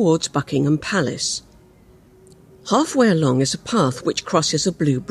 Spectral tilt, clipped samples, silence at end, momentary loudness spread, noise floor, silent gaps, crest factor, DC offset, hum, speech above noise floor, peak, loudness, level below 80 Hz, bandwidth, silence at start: -4.5 dB/octave; under 0.1%; 0.05 s; 7 LU; -50 dBFS; none; 16 dB; under 0.1%; none; 31 dB; -4 dBFS; -20 LUFS; -54 dBFS; 13 kHz; 0 s